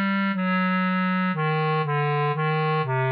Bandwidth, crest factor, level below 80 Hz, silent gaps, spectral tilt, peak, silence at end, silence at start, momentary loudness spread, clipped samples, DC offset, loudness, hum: 5 kHz; 8 dB; -76 dBFS; none; -5.5 dB/octave; -16 dBFS; 0 s; 0 s; 1 LU; under 0.1%; under 0.1%; -23 LUFS; none